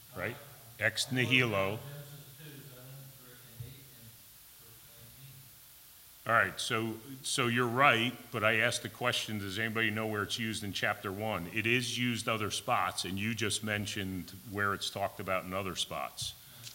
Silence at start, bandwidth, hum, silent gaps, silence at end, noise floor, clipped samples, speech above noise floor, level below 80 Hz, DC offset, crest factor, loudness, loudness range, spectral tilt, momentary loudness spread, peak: 0 s; 16.5 kHz; none; none; 0 s; -56 dBFS; under 0.1%; 23 dB; -68 dBFS; under 0.1%; 24 dB; -32 LUFS; 19 LU; -3.5 dB/octave; 24 LU; -10 dBFS